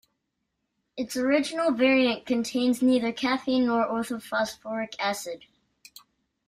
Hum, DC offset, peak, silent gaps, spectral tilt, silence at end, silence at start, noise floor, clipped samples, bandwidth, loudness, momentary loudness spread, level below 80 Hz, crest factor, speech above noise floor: none; under 0.1%; -10 dBFS; none; -3.5 dB/octave; 1.1 s; 0.95 s; -79 dBFS; under 0.1%; 15.5 kHz; -26 LUFS; 12 LU; -66 dBFS; 18 dB; 54 dB